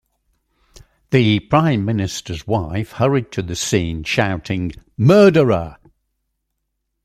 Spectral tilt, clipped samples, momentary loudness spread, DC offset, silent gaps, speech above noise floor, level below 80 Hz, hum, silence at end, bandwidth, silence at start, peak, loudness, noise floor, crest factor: -6 dB/octave; under 0.1%; 13 LU; under 0.1%; none; 58 dB; -44 dBFS; none; 1.3 s; 14.5 kHz; 1.1 s; -2 dBFS; -17 LUFS; -74 dBFS; 18 dB